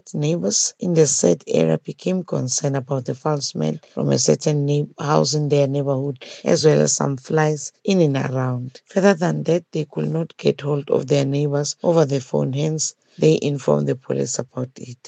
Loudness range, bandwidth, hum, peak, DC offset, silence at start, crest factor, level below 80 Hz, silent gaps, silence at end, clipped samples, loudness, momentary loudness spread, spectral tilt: 2 LU; 9.2 kHz; none; -2 dBFS; under 0.1%; 0.05 s; 18 dB; -68 dBFS; none; 0 s; under 0.1%; -20 LUFS; 8 LU; -5 dB/octave